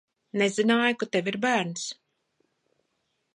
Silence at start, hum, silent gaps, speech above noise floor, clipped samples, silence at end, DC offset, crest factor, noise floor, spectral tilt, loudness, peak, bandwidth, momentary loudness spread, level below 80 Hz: 0.35 s; none; none; 51 dB; under 0.1%; 1.4 s; under 0.1%; 20 dB; -76 dBFS; -4 dB/octave; -26 LUFS; -10 dBFS; 11 kHz; 12 LU; -78 dBFS